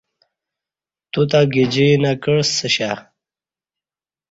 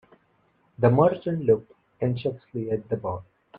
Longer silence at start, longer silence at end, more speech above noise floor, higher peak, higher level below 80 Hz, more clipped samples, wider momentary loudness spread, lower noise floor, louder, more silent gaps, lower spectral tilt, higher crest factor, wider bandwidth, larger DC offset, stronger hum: first, 1.15 s vs 0.8 s; first, 1.3 s vs 0 s; first, over 74 dB vs 42 dB; first, -2 dBFS vs -6 dBFS; about the same, -56 dBFS vs -60 dBFS; neither; about the same, 10 LU vs 12 LU; first, under -90 dBFS vs -66 dBFS; first, -17 LUFS vs -25 LUFS; neither; second, -5 dB/octave vs -11 dB/octave; about the same, 18 dB vs 20 dB; first, 8 kHz vs 4.8 kHz; neither; neither